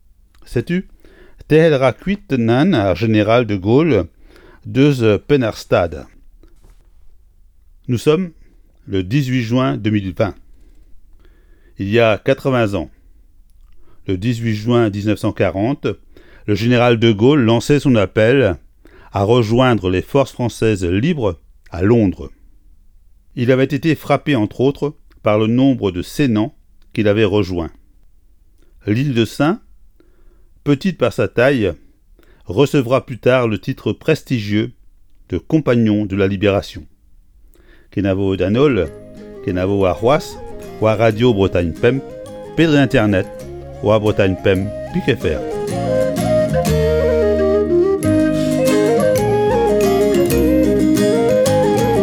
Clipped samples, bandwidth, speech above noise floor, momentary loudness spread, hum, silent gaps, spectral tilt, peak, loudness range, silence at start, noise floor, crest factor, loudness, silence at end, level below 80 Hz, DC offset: under 0.1%; 19 kHz; 32 dB; 11 LU; none; none; -7 dB/octave; 0 dBFS; 5 LU; 0.45 s; -48 dBFS; 16 dB; -16 LUFS; 0 s; -38 dBFS; under 0.1%